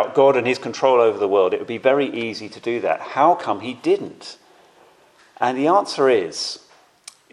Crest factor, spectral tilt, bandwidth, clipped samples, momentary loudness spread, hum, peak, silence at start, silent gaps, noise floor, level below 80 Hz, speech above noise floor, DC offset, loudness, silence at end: 20 dB; -4.5 dB/octave; 11.5 kHz; under 0.1%; 12 LU; none; 0 dBFS; 0 s; none; -53 dBFS; -74 dBFS; 34 dB; under 0.1%; -19 LUFS; 0.75 s